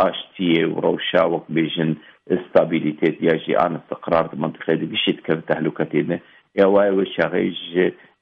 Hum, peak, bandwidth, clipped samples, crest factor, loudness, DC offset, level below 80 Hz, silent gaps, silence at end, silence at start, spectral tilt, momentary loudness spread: none; -4 dBFS; 5.4 kHz; under 0.1%; 16 dB; -20 LUFS; under 0.1%; -60 dBFS; none; 0.3 s; 0 s; -8.5 dB/octave; 7 LU